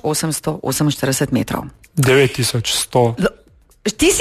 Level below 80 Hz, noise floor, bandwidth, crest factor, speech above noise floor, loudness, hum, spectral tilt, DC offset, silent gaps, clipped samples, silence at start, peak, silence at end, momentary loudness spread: -42 dBFS; -43 dBFS; 14 kHz; 16 dB; 26 dB; -17 LUFS; none; -4 dB/octave; under 0.1%; none; under 0.1%; 0.05 s; -2 dBFS; 0 s; 11 LU